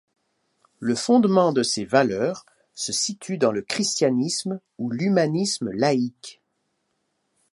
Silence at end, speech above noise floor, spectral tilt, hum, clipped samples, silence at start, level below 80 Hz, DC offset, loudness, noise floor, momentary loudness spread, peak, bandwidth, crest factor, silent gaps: 1.2 s; 52 dB; -4.5 dB/octave; none; under 0.1%; 0.8 s; -66 dBFS; under 0.1%; -23 LUFS; -74 dBFS; 12 LU; -2 dBFS; 11.5 kHz; 20 dB; none